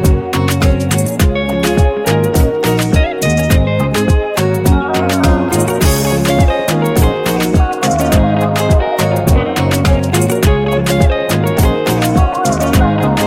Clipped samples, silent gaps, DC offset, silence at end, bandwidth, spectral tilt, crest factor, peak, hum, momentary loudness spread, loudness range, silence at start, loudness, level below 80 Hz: under 0.1%; none; under 0.1%; 0 s; 17 kHz; -5.5 dB/octave; 12 dB; 0 dBFS; none; 2 LU; 0 LU; 0 s; -13 LUFS; -18 dBFS